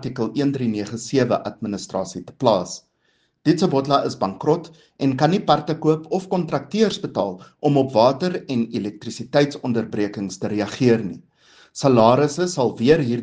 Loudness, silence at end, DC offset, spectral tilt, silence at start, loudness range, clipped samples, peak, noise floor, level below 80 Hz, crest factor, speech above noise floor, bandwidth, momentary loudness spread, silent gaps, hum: -21 LUFS; 0 s; under 0.1%; -6 dB/octave; 0 s; 3 LU; under 0.1%; 0 dBFS; -66 dBFS; -60 dBFS; 20 dB; 46 dB; 9.8 kHz; 10 LU; none; none